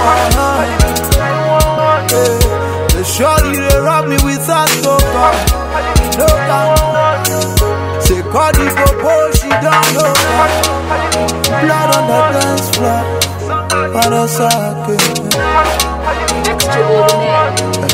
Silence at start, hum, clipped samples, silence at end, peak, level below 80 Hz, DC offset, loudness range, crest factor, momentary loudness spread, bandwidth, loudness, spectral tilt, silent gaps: 0 s; none; under 0.1%; 0 s; 0 dBFS; -20 dBFS; under 0.1%; 2 LU; 12 dB; 4 LU; 16.5 kHz; -11 LUFS; -4 dB/octave; none